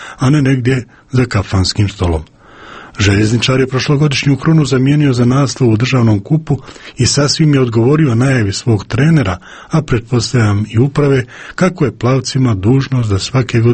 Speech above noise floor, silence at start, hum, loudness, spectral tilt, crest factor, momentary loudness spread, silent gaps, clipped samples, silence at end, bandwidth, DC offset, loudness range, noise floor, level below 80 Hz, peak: 23 dB; 0 s; none; -13 LUFS; -6 dB/octave; 12 dB; 7 LU; none; under 0.1%; 0 s; 8.8 kHz; under 0.1%; 3 LU; -35 dBFS; -34 dBFS; 0 dBFS